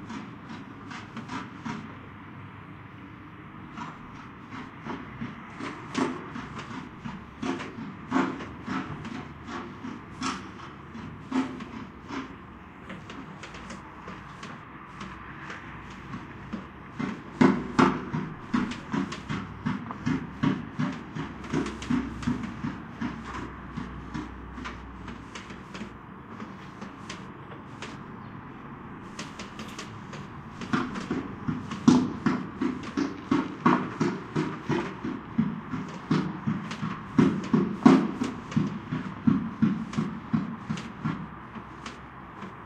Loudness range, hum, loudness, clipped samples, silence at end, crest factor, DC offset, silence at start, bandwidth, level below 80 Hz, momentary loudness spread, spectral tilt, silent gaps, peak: 15 LU; none; -31 LUFS; under 0.1%; 0 s; 28 dB; under 0.1%; 0 s; 9.8 kHz; -52 dBFS; 17 LU; -6.5 dB/octave; none; -4 dBFS